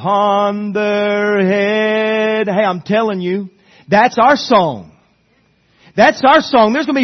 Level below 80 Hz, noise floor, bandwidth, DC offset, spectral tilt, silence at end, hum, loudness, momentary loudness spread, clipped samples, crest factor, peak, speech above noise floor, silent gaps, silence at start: -56 dBFS; -56 dBFS; 6.4 kHz; under 0.1%; -5.5 dB/octave; 0 s; none; -13 LUFS; 9 LU; under 0.1%; 14 dB; 0 dBFS; 43 dB; none; 0 s